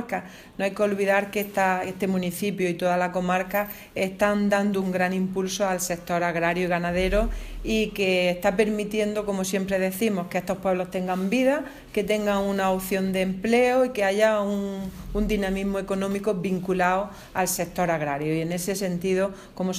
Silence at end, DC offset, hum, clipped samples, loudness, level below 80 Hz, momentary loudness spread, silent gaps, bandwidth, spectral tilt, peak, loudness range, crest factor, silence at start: 0 s; under 0.1%; none; under 0.1%; -25 LUFS; -42 dBFS; 7 LU; none; 16 kHz; -5 dB/octave; -8 dBFS; 2 LU; 16 dB; 0 s